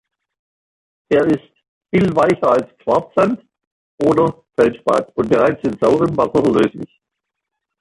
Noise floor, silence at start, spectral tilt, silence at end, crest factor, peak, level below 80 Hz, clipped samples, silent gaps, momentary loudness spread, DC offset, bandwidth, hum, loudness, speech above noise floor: -80 dBFS; 1.1 s; -7.5 dB/octave; 0.95 s; 16 dB; -2 dBFS; -50 dBFS; under 0.1%; 1.68-1.81 s, 3.67-3.98 s; 5 LU; under 0.1%; 11.5 kHz; none; -16 LUFS; 64 dB